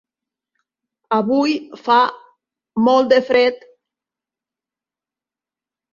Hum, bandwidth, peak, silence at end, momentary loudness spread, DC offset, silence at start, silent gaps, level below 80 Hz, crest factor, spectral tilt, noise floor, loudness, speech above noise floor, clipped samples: none; 7.2 kHz; -2 dBFS; 2.35 s; 9 LU; under 0.1%; 1.1 s; none; -66 dBFS; 18 dB; -5.5 dB/octave; -89 dBFS; -16 LUFS; 74 dB; under 0.1%